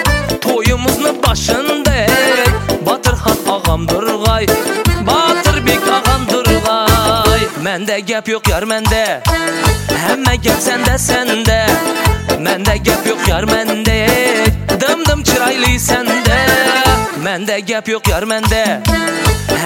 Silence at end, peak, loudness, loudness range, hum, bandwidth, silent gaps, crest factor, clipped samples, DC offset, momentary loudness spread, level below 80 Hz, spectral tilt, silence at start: 0 s; 0 dBFS; -13 LUFS; 2 LU; none; 17 kHz; none; 12 dB; under 0.1%; under 0.1%; 4 LU; -22 dBFS; -4 dB/octave; 0 s